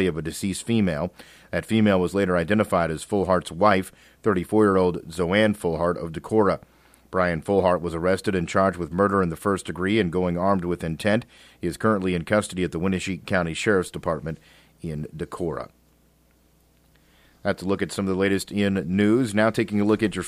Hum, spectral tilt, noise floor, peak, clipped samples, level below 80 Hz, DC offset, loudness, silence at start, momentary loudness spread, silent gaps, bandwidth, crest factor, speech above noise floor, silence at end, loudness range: none; -6 dB/octave; -60 dBFS; -4 dBFS; under 0.1%; -50 dBFS; under 0.1%; -24 LUFS; 0 s; 10 LU; none; 15 kHz; 20 dB; 37 dB; 0 s; 7 LU